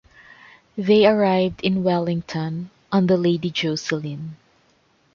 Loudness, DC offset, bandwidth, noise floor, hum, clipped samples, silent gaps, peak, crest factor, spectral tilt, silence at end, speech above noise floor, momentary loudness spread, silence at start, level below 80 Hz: -21 LUFS; under 0.1%; 7.2 kHz; -61 dBFS; none; under 0.1%; none; -4 dBFS; 18 dB; -6.5 dB/octave; 0.8 s; 41 dB; 16 LU; 0.75 s; -56 dBFS